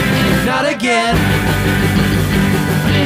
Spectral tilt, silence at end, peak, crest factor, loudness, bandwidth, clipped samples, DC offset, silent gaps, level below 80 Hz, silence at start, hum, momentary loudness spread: -5.5 dB/octave; 0 s; -2 dBFS; 12 dB; -14 LUFS; 16.5 kHz; under 0.1%; under 0.1%; none; -26 dBFS; 0 s; none; 2 LU